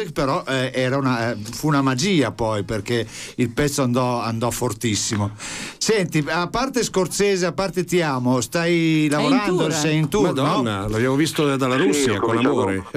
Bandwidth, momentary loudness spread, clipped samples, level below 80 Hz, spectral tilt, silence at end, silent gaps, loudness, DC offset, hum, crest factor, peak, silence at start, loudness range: 16 kHz; 6 LU; under 0.1%; -46 dBFS; -5 dB/octave; 0.05 s; none; -20 LUFS; 0.1%; none; 12 dB; -8 dBFS; 0 s; 3 LU